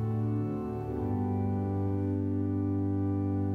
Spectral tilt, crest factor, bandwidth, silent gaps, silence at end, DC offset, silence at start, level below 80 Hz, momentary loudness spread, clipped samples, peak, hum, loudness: -11.5 dB/octave; 10 dB; 2.8 kHz; none; 0 s; under 0.1%; 0 s; -52 dBFS; 3 LU; under 0.1%; -20 dBFS; none; -31 LUFS